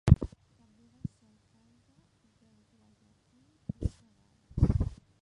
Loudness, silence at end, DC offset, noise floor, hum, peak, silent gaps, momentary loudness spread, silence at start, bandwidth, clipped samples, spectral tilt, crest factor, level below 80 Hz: -32 LUFS; 0.25 s; under 0.1%; -67 dBFS; none; -4 dBFS; none; 19 LU; 0.05 s; 10.5 kHz; under 0.1%; -9 dB/octave; 30 dB; -38 dBFS